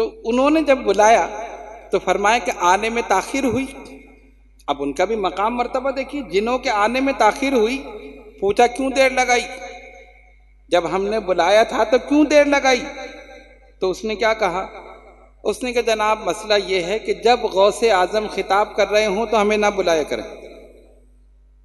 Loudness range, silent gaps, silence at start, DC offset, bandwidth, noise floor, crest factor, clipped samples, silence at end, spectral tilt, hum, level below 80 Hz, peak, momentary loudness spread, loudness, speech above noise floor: 5 LU; none; 0 s; under 0.1%; 12.5 kHz; -50 dBFS; 18 dB; under 0.1%; 1 s; -3.5 dB/octave; none; -46 dBFS; 0 dBFS; 15 LU; -18 LUFS; 32 dB